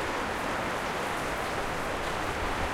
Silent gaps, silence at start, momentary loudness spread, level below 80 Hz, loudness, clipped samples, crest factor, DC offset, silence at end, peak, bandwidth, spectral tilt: none; 0 s; 1 LU; -44 dBFS; -31 LUFS; under 0.1%; 14 dB; under 0.1%; 0 s; -18 dBFS; 16.5 kHz; -4 dB/octave